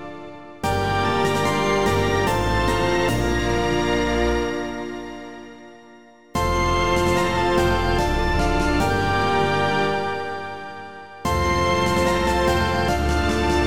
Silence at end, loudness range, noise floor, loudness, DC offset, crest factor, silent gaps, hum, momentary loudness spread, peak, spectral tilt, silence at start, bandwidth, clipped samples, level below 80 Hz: 0 s; 4 LU; -47 dBFS; -21 LUFS; 1%; 14 dB; none; none; 13 LU; -6 dBFS; -5 dB/octave; 0 s; over 20 kHz; under 0.1%; -30 dBFS